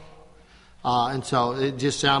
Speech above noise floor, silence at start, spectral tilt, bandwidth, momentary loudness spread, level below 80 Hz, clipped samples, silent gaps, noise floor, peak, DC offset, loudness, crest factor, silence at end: 28 dB; 0 s; -4 dB/octave; 11.5 kHz; 3 LU; -54 dBFS; under 0.1%; none; -52 dBFS; -6 dBFS; under 0.1%; -24 LUFS; 18 dB; 0 s